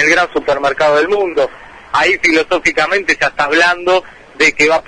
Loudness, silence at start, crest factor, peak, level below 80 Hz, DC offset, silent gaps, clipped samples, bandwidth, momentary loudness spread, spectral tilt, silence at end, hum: -12 LUFS; 0 s; 14 dB; 0 dBFS; -44 dBFS; under 0.1%; none; under 0.1%; 10.5 kHz; 6 LU; -2.5 dB/octave; 0.05 s; none